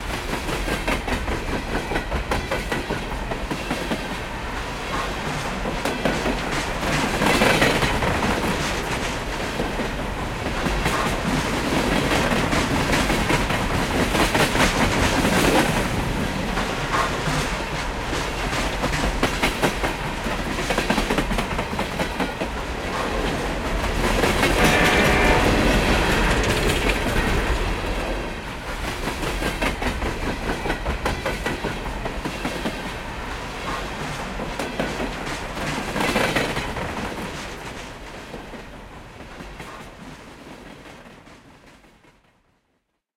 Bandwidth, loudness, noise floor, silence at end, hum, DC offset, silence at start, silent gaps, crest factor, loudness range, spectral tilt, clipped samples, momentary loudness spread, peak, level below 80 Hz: 16.5 kHz; -23 LUFS; -72 dBFS; 1.45 s; none; under 0.1%; 0 s; none; 18 dB; 9 LU; -4.5 dB/octave; under 0.1%; 12 LU; -4 dBFS; -32 dBFS